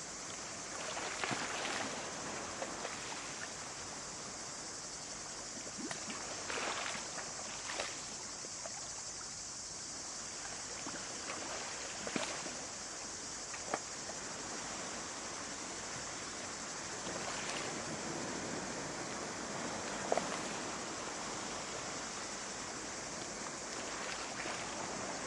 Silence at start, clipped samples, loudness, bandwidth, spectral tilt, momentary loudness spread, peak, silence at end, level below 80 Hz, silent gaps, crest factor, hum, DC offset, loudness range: 0 s; under 0.1%; -41 LUFS; 11.5 kHz; -1.5 dB/octave; 5 LU; -16 dBFS; 0 s; -68 dBFS; none; 26 dB; none; under 0.1%; 2 LU